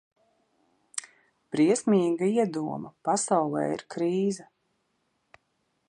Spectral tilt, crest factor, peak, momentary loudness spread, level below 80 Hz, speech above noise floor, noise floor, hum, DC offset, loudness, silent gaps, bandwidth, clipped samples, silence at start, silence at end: -5.5 dB/octave; 18 dB; -12 dBFS; 14 LU; -74 dBFS; 49 dB; -75 dBFS; none; under 0.1%; -27 LUFS; none; 11.5 kHz; under 0.1%; 0.95 s; 1.45 s